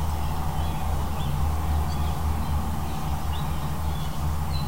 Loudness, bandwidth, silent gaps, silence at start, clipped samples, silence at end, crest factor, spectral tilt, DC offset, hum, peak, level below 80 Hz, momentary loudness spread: -29 LUFS; 16 kHz; none; 0 s; under 0.1%; 0 s; 12 dB; -6 dB/octave; 3%; none; -14 dBFS; -30 dBFS; 3 LU